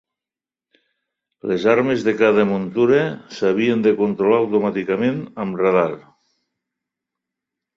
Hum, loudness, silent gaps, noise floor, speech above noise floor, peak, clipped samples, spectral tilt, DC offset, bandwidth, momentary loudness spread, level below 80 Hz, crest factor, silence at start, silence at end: none; -18 LUFS; none; -90 dBFS; 72 dB; -2 dBFS; under 0.1%; -7 dB/octave; under 0.1%; 7.4 kHz; 9 LU; -62 dBFS; 18 dB; 1.45 s; 1.75 s